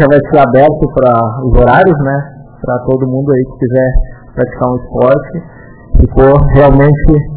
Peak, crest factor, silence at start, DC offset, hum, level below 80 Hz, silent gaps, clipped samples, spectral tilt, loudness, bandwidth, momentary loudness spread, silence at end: 0 dBFS; 8 dB; 0 s; under 0.1%; none; -18 dBFS; none; 3%; -12.5 dB/octave; -9 LUFS; 4 kHz; 11 LU; 0 s